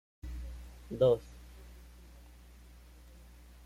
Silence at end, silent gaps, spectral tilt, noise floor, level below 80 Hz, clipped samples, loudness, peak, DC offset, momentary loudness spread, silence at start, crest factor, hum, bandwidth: 0 s; none; -7.5 dB/octave; -55 dBFS; -50 dBFS; under 0.1%; -33 LUFS; -16 dBFS; under 0.1%; 28 LU; 0.25 s; 22 dB; 60 Hz at -55 dBFS; 15.5 kHz